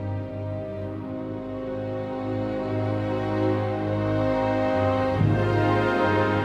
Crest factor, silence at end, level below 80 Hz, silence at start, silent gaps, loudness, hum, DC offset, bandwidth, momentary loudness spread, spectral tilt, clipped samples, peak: 14 dB; 0 s; -46 dBFS; 0 s; none; -25 LUFS; none; under 0.1%; 7.6 kHz; 10 LU; -8.5 dB/octave; under 0.1%; -10 dBFS